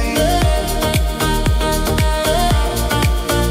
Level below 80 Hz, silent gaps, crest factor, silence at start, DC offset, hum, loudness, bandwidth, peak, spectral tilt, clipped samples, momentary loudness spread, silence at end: -20 dBFS; none; 14 dB; 0 s; under 0.1%; none; -17 LUFS; 16 kHz; -2 dBFS; -4.5 dB/octave; under 0.1%; 2 LU; 0 s